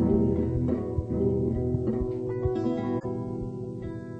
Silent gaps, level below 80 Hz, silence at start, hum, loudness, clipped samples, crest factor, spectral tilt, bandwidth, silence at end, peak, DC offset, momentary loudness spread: none; -40 dBFS; 0 s; none; -29 LUFS; under 0.1%; 16 dB; -11 dB/octave; 8 kHz; 0 s; -12 dBFS; under 0.1%; 9 LU